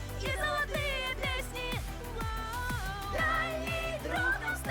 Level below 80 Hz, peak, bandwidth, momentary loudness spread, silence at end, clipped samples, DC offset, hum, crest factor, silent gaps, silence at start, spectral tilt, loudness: -42 dBFS; -18 dBFS; over 20 kHz; 6 LU; 0 s; under 0.1%; under 0.1%; none; 16 dB; none; 0 s; -4 dB/octave; -33 LUFS